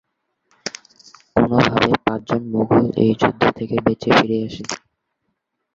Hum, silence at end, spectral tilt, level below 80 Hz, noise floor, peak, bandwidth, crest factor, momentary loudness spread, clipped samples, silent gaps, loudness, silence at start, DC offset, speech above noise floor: none; 0.95 s; -6 dB/octave; -48 dBFS; -74 dBFS; 0 dBFS; 7.8 kHz; 20 dB; 15 LU; under 0.1%; none; -18 LUFS; 0.65 s; under 0.1%; 57 dB